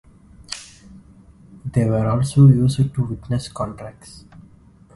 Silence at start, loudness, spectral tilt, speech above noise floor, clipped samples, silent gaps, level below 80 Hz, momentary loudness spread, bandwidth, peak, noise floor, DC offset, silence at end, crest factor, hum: 0.5 s; -18 LUFS; -7.5 dB/octave; 31 dB; under 0.1%; none; -44 dBFS; 21 LU; 11.5 kHz; -2 dBFS; -49 dBFS; under 0.1%; 1.05 s; 18 dB; none